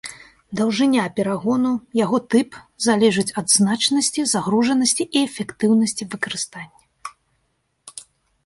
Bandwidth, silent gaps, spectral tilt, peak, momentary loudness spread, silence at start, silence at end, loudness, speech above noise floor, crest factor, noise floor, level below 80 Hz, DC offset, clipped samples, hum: 11.5 kHz; none; -3.5 dB/octave; -4 dBFS; 21 LU; 0.05 s; 0.45 s; -19 LUFS; 50 dB; 18 dB; -69 dBFS; -62 dBFS; under 0.1%; under 0.1%; none